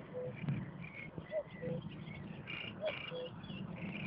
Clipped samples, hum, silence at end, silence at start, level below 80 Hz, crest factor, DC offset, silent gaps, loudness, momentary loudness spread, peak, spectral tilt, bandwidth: under 0.1%; none; 0 s; 0 s; -66 dBFS; 16 dB; under 0.1%; none; -44 LUFS; 7 LU; -28 dBFS; -5 dB/octave; 5.6 kHz